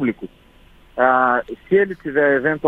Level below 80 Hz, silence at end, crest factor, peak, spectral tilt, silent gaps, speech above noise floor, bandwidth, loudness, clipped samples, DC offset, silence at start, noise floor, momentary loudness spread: -52 dBFS; 0 s; 18 dB; 0 dBFS; -8.5 dB/octave; none; 31 dB; 4 kHz; -18 LUFS; under 0.1%; under 0.1%; 0 s; -49 dBFS; 18 LU